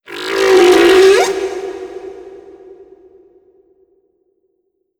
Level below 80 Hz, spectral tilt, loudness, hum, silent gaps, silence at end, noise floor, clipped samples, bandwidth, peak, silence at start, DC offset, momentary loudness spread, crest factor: -50 dBFS; -2.5 dB/octave; -10 LUFS; none; none; 2.6 s; -66 dBFS; under 0.1%; 17 kHz; 0 dBFS; 0.1 s; under 0.1%; 23 LU; 14 dB